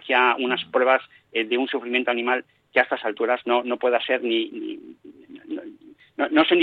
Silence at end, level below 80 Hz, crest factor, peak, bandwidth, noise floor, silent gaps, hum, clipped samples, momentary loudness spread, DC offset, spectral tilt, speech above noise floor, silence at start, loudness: 0 s; -74 dBFS; 18 dB; -4 dBFS; 4.9 kHz; -47 dBFS; none; none; under 0.1%; 15 LU; under 0.1%; -6 dB/octave; 25 dB; 0.05 s; -22 LUFS